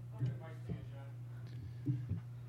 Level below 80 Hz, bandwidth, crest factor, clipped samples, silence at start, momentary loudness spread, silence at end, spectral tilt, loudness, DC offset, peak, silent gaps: -64 dBFS; 6.2 kHz; 18 dB; under 0.1%; 0 s; 8 LU; 0 s; -9 dB/octave; -44 LUFS; under 0.1%; -26 dBFS; none